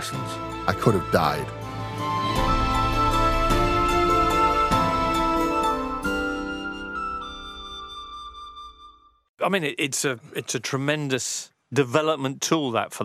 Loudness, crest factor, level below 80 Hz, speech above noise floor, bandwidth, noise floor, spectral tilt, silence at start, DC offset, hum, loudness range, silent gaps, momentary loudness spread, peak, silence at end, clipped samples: -24 LUFS; 20 dB; -36 dBFS; 26 dB; 15.5 kHz; -51 dBFS; -4.5 dB/octave; 0 s; under 0.1%; none; 10 LU; 9.29-9.34 s; 15 LU; -4 dBFS; 0 s; under 0.1%